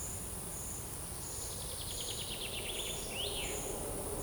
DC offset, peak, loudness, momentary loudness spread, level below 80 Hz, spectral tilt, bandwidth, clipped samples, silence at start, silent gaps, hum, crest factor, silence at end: under 0.1%; -24 dBFS; -38 LUFS; 4 LU; -50 dBFS; -2 dB/octave; over 20 kHz; under 0.1%; 0 s; none; none; 16 dB; 0 s